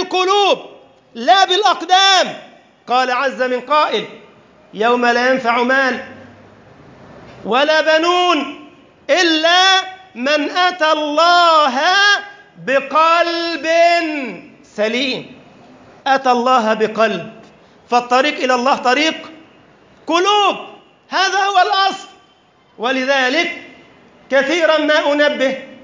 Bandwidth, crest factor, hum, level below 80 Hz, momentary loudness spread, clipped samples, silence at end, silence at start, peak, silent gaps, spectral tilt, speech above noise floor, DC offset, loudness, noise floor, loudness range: 7.6 kHz; 14 dB; none; -66 dBFS; 14 LU; under 0.1%; 0.1 s; 0 s; -2 dBFS; none; -2 dB/octave; 38 dB; under 0.1%; -14 LUFS; -52 dBFS; 5 LU